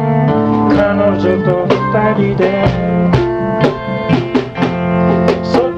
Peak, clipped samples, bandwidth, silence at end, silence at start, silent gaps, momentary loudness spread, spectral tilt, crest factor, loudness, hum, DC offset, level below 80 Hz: 0 dBFS; under 0.1%; 7.6 kHz; 0 s; 0 s; none; 4 LU; -8.5 dB/octave; 12 dB; -13 LUFS; none; under 0.1%; -34 dBFS